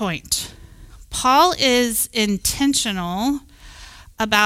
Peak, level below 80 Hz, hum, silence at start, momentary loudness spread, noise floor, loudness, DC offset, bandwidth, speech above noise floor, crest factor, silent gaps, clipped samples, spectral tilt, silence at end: -2 dBFS; -42 dBFS; none; 0 s; 11 LU; -42 dBFS; -19 LUFS; under 0.1%; 16.5 kHz; 23 dB; 18 dB; none; under 0.1%; -2.5 dB/octave; 0 s